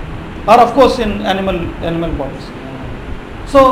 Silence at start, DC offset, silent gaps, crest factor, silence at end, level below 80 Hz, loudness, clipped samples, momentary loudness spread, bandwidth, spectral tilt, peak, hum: 0 s; under 0.1%; none; 14 dB; 0 s; -28 dBFS; -13 LUFS; 0.2%; 19 LU; 16 kHz; -6 dB/octave; 0 dBFS; none